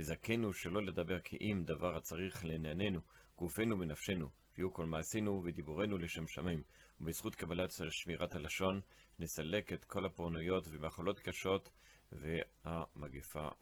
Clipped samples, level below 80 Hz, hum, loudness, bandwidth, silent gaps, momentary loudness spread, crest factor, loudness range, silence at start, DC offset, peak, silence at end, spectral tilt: under 0.1%; -62 dBFS; none; -42 LUFS; over 20 kHz; none; 8 LU; 18 dB; 2 LU; 0 s; under 0.1%; -22 dBFS; 0.05 s; -5 dB/octave